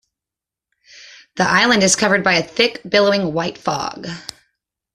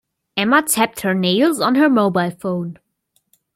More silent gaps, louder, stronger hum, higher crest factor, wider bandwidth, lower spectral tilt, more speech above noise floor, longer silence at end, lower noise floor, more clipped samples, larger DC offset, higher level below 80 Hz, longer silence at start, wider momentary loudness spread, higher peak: neither; about the same, -16 LUFS vs -17 LUFS; neither; about the same, 18 dB vs 16 dB; second, 13.5 kHz vs 16.5 kHz; about the same, -3 dB/octave vs -4 dB/octave; first, 70 dB vs 50 dB; about the same, 0.75 s vs 0.8 s; first, -87 dBFS vs -67 dBFS; neither; neither; first, -54 dBFS vs -62 dBFS; first, 1 s vs 0.35 s; first, 17 LU vs 10 LU; about the same, 0 dBFS vs -2 dBFS